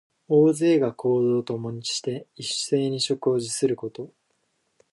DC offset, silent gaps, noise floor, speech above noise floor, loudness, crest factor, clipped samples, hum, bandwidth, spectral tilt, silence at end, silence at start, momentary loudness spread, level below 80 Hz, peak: under 0.1%; none; -72 dBFS; 48 dB; -24 LUFS; 16 dB; under 0.1%; none; 11.5 kHz; -5 dB/octave; 0.85 s; 0.3 s; 13 LU; -70 dBFS; -8 dBFS